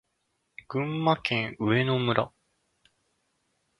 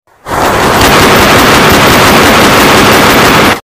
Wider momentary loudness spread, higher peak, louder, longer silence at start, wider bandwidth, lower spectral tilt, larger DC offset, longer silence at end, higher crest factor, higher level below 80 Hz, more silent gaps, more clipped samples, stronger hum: first, 8 LU vs 4 LU; second, -6 dBFS vs 0 dBFS; second, -27 LUFS vs -3 LUFS; first, 0.7 s vs 0.25 s; second, 11.5 kHz vs 19.5 kHz; first, -7.5 dB/octave vs -3.5 dB/octave; second, under 0.1% vs 0.5%; first, 1.5 s vs 0.05 s; first, 24 dB vs 4 dB; second, -64 dBFS vs -24 dBFS; neither; second, under 0.1% vs 1%; neither